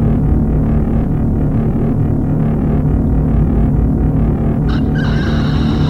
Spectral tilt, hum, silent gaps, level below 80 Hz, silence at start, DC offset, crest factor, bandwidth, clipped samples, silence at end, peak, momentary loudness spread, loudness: -9.5 dB/octave; none; none; -18 dBFS; 0 s; under 0.1%; 12 dB; 6 kHz; under 0.1%; 0 s; -2 dBFS; 2 LU; -15 LUFS